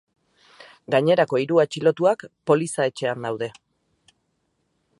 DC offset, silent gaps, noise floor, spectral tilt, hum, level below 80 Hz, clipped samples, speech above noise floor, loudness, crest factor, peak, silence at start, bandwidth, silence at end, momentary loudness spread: under 0.1%; none; -72 dBFS; -5.5 dB/octave; none; -70 dBFS; under 0.1%; 51 dB; -22 LUFS; 20 dB; -4 dBFS; 0.6 s; 11.5 kHz; 1.5 s; 9 LU